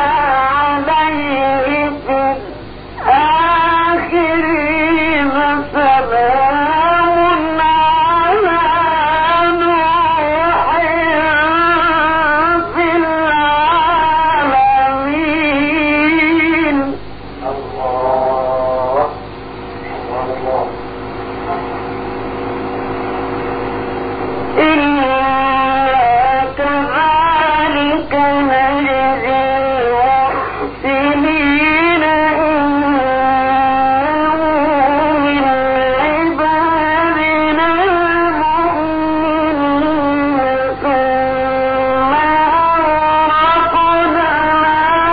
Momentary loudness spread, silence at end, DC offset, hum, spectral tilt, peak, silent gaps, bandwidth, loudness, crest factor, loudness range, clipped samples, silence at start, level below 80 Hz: 9 LU; 0 s; under 0.1%; 50 Hz at -35 dBFS; -10.5 dB/octave; 0 dBFS; none; 5 kHz; -13 LUFS; 12 dB; 6 LU; under 0.1%; 0 s; -38 dBFS